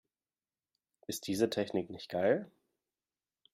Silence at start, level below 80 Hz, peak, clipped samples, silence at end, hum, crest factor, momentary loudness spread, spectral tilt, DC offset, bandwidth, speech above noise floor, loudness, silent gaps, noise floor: 1.1 s; -74 dBFS; -16 dBFS; under 0.1%; 1.05 s; none; 22 dB; 14 LU; -5 dB/octave; under 0.1%; 15.5 kHz; over 56 dB; -35 LUFS; none; under -90 dBFS